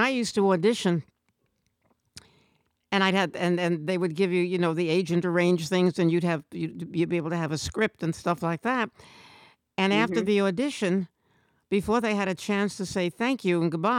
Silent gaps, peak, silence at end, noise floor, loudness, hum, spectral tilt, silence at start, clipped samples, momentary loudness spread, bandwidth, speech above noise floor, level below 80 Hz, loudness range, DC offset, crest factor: none; -10 dBFS; 0 s; -74 dBFS; -26 LUFS; none; -5.5 dB/octave; 0 s; under 0.1%; 6 LU; 14.5 kHz; 48 dB; -60 dBFS; 4 LU; under 0.1%; 16 dB